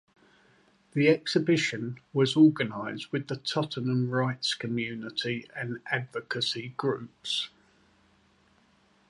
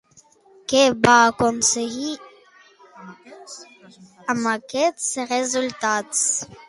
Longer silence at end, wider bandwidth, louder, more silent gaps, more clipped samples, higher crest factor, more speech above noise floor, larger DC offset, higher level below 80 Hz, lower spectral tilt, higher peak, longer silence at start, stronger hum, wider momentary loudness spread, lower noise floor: first, 1.65 s vs 0.15 s; about the same, 11.5 kHz vs 11.5 kHz; second, -29 LUFS vs -20 LUFS; neither; neither; about the same, 20 dB vs 22 dB; about the same, 36 dB vs 33 dB; neither; second, -72 dBFS vs -58 dBFS; first, -5.5 dB/octave vs -2 dB/octave; second, -10 dBFS vs 0 dBFS; first, 0.95 s vs 0.7 s; neither; second, 12 LU vs 21 LU; first, -65 dBFS vs -54 dBFS